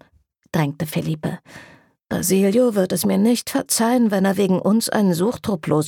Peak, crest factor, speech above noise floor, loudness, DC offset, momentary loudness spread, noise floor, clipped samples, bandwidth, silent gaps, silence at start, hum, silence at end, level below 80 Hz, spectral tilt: -6 dBFS; 14 dB; 41 dB; -19 LUFS; under 0.1%; 9 LU; -59 dBFS; under 0.1%; 19 kHz; none; 0.55 s; none; 0 s; -56 dBFS; -5.5 dB/octave